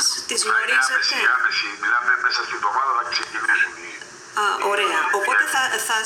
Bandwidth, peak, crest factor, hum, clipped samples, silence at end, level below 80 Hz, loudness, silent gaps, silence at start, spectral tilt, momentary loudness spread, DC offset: 17 kHz; -6 dBFS; 16 dB; none; under 0.1%; 0 s; -70 dBFS; -19 LUFS; none; 0 s; 1 dB/octave; 6 LU; under 0.1%